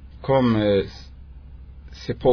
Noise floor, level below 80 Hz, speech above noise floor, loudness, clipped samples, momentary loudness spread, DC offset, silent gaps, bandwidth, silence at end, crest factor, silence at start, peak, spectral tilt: -41 dBFS; -40 dBFS; 22 dB; -21 LUFS; under 0.1%; 24 LU; under 0.1%; none; 5.4 kHz; 0 s; 16 dB; 0 s; -6 dBFS; -8 dB/octave